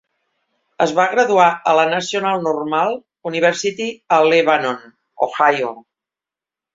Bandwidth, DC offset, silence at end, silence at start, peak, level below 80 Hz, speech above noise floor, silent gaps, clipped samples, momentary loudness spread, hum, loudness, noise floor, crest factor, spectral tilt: 7.8 kHz; under 0.1%; 0.95 s; 0.8 s; -2 dBFS; -66 dBFS; 72 dB; none; under 0.1%; 11 LU; none; -17 LUFS; -88 dBFS; 16 dB; -4 dB/octave